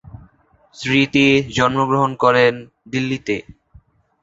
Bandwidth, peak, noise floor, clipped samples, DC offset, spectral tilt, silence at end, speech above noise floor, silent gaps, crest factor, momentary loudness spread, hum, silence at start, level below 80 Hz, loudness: 8 kHz; -2 dBFS; -53 dBFS; under 0.1%; under 0.1%; -5.5 dB/octave; 0.8 s; 36 dB; none; 18 dB; 12 LU; none; 0.15 s; -50 dBFS; -17 LUFS